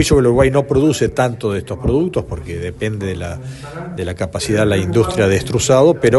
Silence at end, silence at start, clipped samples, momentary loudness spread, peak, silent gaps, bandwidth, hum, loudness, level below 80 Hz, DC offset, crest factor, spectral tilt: 0 s; 0 s; under 0.1%; 14 LU; 0 dBFS; none; 12 kHz; none; -16 LUFS; -32 dBFS; under 0.1%; 16 dB; -5.5 dB/octave